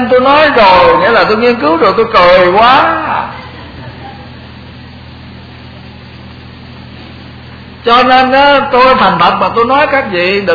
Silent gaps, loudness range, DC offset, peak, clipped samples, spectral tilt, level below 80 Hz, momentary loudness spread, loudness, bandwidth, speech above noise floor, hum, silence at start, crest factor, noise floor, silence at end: none; 23 LU; under 0.1%; 0 dBFS; 0.8%; -6 dB/octave; -36 dBFS; 23 LU; -7 LUFS; 5.4 kHz; 23 dB; none; 0 s; 10 dB; -30 dBFS; 0 s